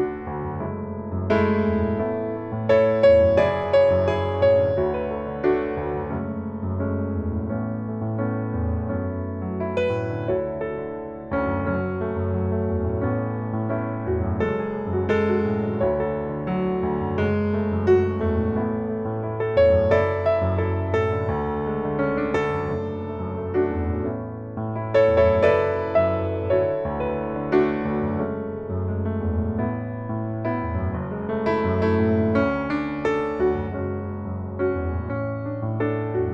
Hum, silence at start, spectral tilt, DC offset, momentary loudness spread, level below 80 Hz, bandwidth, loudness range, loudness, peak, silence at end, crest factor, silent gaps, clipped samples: none; 0 s; -9 dB/octave; under 0.1%; 10 LU; -40 dBFS; 7.2 kHz; 7 LU; -24 LUFS; -6 dBFS; 0 s; 18 dB; none; under 0.1%